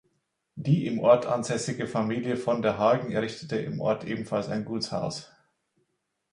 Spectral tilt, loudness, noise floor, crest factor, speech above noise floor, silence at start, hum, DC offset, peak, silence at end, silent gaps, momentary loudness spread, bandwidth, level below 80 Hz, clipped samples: -6 dB/octave; -27 LUFS; -78 dBFS; 22 dB; 51 dB; 0.55 s; none; under 0.1%; -6 dBFS; 1.05 s; none; 10 LU; 11 kHz; -64 dBFS; under 0.1%